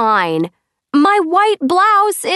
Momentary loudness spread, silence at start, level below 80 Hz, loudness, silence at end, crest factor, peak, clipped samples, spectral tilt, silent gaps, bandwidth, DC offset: 8 LU; 0 s; -68 dBFS; -13 LUFS; 0 s; 12 dB; 0 dBFS; under 0.1%; -4 dB/octave; none; 12.5 kHz; under 0.1%